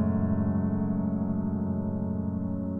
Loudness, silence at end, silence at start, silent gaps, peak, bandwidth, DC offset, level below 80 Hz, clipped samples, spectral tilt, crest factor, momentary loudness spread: -29 LUFS; 0 s; 0 s; none; -16 dBFS; 2.4 kHz; under 0.1%; -50 dBFS; under 0.1%; -13.5 dB/octave; 12 dB; 4 LU